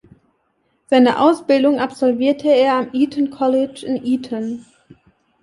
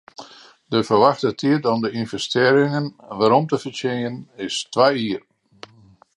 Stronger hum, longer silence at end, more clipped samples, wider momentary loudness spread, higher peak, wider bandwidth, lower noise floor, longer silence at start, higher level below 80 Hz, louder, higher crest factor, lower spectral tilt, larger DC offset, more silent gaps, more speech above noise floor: neither; second, 0.8 s vs 1 s; neither; second, 10 LU vs 13 LU; about the same, -2 dBFS vs -2 dBFS; about the same, 11.5 kHz vs 11.5 kHz; first, -65 dBFS vs -51 dBFS; first, 0.9 s vs 0.2 s; about the same, -62 dBFS vs -62 dBFS; first, -17 LUFS vs -20 LUFS; about the same, 16 dB vs 20 dB; about the same, -5.5 dB/octave vs -5.5 dB/octave; neither; neither; first, 49 dB vs 32 dB